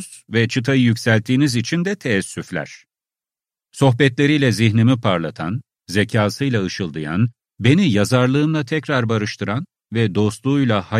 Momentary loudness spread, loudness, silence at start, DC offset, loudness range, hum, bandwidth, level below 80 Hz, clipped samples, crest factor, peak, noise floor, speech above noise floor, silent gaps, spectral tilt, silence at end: 10 LU; -18 LUFS; 0 s; under 0.1%; 2 LU; none; 14 kHz; -54 dBFS; under 0.1%; 16 dB; -2 dBFS; under -90 dBFS; over 73 dB; none; -6 dB/octave; 0 s